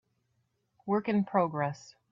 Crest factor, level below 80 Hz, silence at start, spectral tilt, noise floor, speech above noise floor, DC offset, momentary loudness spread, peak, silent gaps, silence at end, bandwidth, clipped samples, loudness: 20 dB; -74 dBFS; 0.85 s; -7.5 dB/octave; -77 dBFS; 47 dB; under 0.1%; 16 LU; -12 dBFS; none; 0.2 s; 7.4 kHz; under 0.1%; -30 LUFS